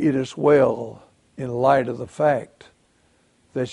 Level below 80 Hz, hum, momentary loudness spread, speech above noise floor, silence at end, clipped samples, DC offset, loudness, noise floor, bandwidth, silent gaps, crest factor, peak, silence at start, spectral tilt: -60 dBFS; none; 16 LU; 41 dB; 0 s; under 0.1%; under 0.1%; -21 LUFS; -61 dBFS; 11 kHz; none; 18 dB; -4 dBFS; 0 s; -7 dB/octave